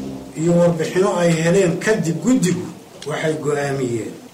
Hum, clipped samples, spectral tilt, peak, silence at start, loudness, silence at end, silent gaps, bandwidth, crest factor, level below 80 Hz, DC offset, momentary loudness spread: none; under 0.1%; -6 dB/octave; -6 dBFS; 0 s; -18 LUFS; 0.05 s; none; 15.5 kHz; 12 dB; -52 dBFS; under 0.1%; 11 LU